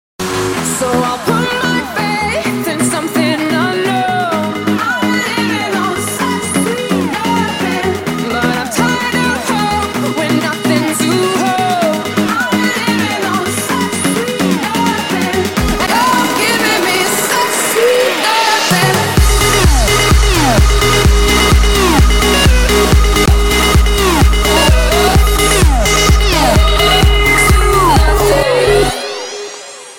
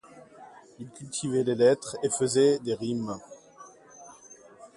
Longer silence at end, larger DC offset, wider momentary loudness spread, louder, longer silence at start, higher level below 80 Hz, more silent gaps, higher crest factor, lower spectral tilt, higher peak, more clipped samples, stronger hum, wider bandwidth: about the same, 0 s vs 0.1 s; first, 0.3% vs under 0.1%; second, 6 LU vs 25 LU; first, -12 LUFS vs -26 LUFS; about the same, 0.2 s vs 0.15 s; first, -18 dBFS vs -68 dBFS; neither; second, 12 dB vs 18 dB; about the same, -4 dB/octave vs -4.5 dB/octave; first, 0 dBFS vs -10 dBFS; neither; neither; first, 17 kHz vs 11.5 kHz